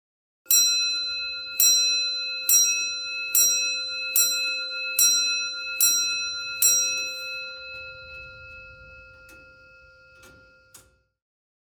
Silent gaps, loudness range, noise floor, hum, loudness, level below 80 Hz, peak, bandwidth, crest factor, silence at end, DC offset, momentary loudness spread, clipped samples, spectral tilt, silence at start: none; 13 LU; -55 dBFS; none; -21 LUFS; -62 dBFS; -6 dBFS; 19 kHz; 20 dB; 0.9 s; under 0.1%; 19 LU; under 0.1%; 3.5 dB/octave; 0.5 s